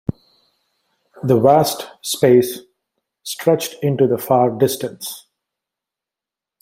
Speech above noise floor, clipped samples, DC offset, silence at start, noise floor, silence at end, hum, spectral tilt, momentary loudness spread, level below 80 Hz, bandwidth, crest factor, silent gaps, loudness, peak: 71 dB; under 0.1%; under 0.1%; 0.1 s; -87 dBFS; 1.45 s; none; -5.5 dB/octave; 16 LU; -56 dBFS; 16.5 kHz; 18 dB; none; -17 LUFS; -2 dBFS